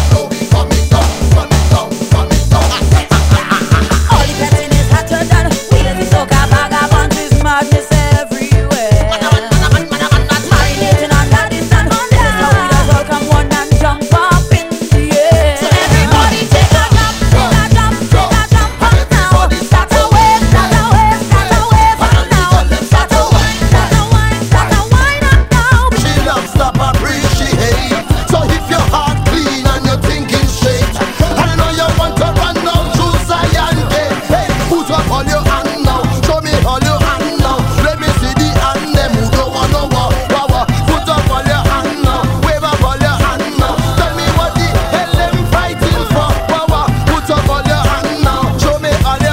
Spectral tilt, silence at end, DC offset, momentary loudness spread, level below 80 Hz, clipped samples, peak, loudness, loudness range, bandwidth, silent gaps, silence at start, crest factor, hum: -5 dB/octave; 0 s; under 0.1%; 4 LU; -16 dBFS; 1%; 0 dBFS; -11 LUFS; 3 LU; 16.5 kHz; none; 0 s; 10 dB; none